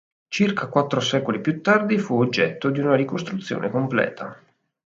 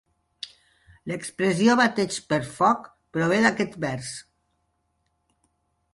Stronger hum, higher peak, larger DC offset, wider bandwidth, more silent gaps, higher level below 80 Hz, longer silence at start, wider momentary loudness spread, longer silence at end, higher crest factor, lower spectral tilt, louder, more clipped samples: neither; first, -2 dBFS vs -6 dBFS; neither; second, 7.8 kHz vs 11.5 kHz; neither; about the same, -66 dBFS vs -62 dBFS; second, 0.3 s vs 0.45 s; second, 9 LU vs 20 LU; second, 0.5 s vs 1.7 s; about the same, 20 dB vs 20 dB; first, -6 dB/octave vs -4.5 dB/octave; about the same, -22 LUFS vs -24 LUFS; neither